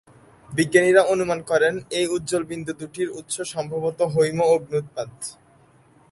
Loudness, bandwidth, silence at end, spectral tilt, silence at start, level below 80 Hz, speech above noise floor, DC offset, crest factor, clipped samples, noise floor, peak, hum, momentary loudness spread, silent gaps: -22 LUFS; 11.5 kHz; 0.8 s; -4.5 dB/octave; 0.5 s; -60 dBFS; 33 dB; under 0.1%; 20 dB; under 0.1%; -55 dBFS; -2 dBFS; none; 14 LU; none